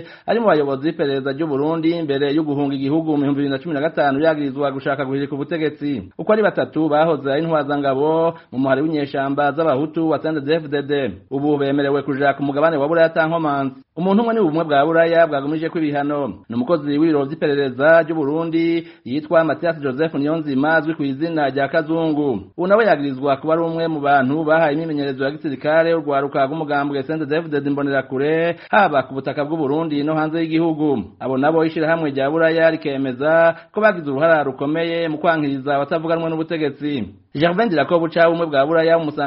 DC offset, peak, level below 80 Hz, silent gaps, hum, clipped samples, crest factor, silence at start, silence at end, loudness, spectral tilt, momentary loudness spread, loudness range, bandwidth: under 0.1%; -2 dBFS; -60 dBFS; none; none; under 0.1%; 16 dB; 0 s; 0 s; -19 LUFS; -5 dB/octave; 7 LU; 2 LU; 5.6 kHz